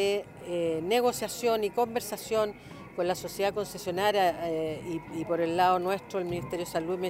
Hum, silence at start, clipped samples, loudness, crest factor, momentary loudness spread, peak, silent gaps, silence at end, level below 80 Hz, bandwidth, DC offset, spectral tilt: none; 0 s; under 0.1%; -30 LUFS; 16 dB; 9 LU; -12 dBFS; none; 0 s; -60 dBFS; 16 kHz; under 0.1%; -4.5 dB/octave